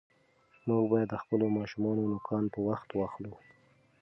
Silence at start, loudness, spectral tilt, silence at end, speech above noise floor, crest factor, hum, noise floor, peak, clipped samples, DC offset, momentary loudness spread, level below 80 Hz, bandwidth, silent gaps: 0.65 s; -32 LUFS; -9.5 dB/octave; 0.65 s; 35 dB; 18 dB; none; -66 dBFS; -14 dBFS; under 0.1%; under 0.1%; 10 LU; -66 dBFS; 6 kHz; none